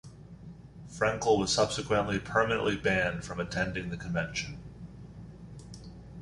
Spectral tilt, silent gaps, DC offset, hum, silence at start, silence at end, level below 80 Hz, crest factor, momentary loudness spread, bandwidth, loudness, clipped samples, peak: -4.5 dB/octave; none; under 0.1%; none; 0.05 s; 0 s; -52 dBFS; 20 dB; 21 LU; 11.5 kHz; -30 LUFS; under 0.1%; -12 dBFS